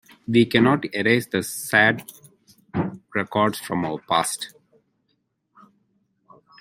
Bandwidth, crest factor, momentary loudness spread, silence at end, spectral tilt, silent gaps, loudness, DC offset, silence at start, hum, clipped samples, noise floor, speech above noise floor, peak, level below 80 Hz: 16.5 kHz; 22 dB; 13 LU; 2.15 s; -4.5 dB/octave; none; -22 LUFS; under 0.1%; 0.3 s; none; under 0.1%; -72 dBFS; 51 dB; -2 dBFS; -62 dBFS